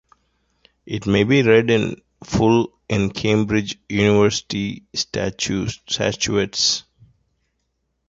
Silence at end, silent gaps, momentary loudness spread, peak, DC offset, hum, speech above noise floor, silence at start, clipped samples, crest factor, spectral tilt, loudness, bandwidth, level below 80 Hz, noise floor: 1.3 s; none; 10 LU; -2 dBFS; under 0.1%; none; 53 dB; 0.85 s; under 0.1%; 18 dB; -4.5 dB/octave; -19 LUFS; 7.8 kHz; -46 dBFS; -72 dBFS